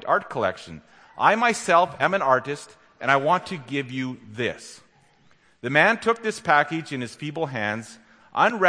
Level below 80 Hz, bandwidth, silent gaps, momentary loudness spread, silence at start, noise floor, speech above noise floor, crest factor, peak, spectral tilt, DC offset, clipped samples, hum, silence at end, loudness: -66 dBFS; 10.5 kHz; none; 14 LU; 0.05 s; -58 dBFS; 35 dB; 22 dB; -2 dBFS; -4.5 dB/octave; under 0.1%; under 0.1%; none; 0 s; -23 LUFS